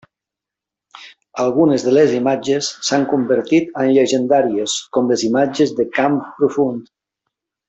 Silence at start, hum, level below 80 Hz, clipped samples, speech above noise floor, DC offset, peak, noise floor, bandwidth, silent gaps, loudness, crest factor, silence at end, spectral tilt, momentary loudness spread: 0.95 s; none; -60 dBFS; under 0.1%; 70 dB; under 0.1%; -2 dBFS; -86 dBFS; 8.4 kHz; none; -16 LUFS; 14 dB; 0.85 s; -4.5 dB/octave; 6 LU